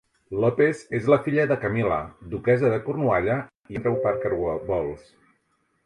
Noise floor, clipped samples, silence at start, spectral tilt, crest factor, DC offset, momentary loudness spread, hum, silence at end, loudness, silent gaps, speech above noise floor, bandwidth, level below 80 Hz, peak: -70 dBFS; under 0.1%; 0.3 s; -8.5 dB/octave; 18 dB; under 0.1%; 9 LU; none; 0.85 s; -24 LUFS; 3.57-3.61 s; 46 dB; 11 kHz; -50 dBFS; -6 dBFS